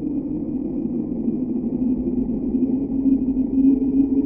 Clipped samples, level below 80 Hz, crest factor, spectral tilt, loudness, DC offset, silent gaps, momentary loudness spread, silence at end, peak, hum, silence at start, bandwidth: under 0.1%; -40 dBFS; 14 dB; -13.5 dB/octave; -22 LUFS; under 0.1%; none; 8 LU; 0 s; -8 dBFS; none; 0 s; 2.6 kHz